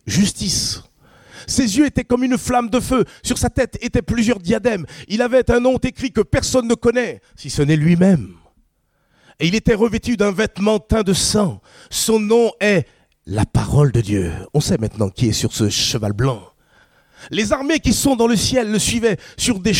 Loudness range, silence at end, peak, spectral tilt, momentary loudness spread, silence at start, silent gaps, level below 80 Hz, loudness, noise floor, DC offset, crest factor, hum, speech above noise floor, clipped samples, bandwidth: 2 LU; 0 s; -2 dBFS; -5 dB/octave; 7 LU; 0.05 s; none; -36 dBFS; -18 LUFS; -63 dBFS; under 0.1%; 16 dB; none; 46 dB; under 0.1%; 16.5 kHz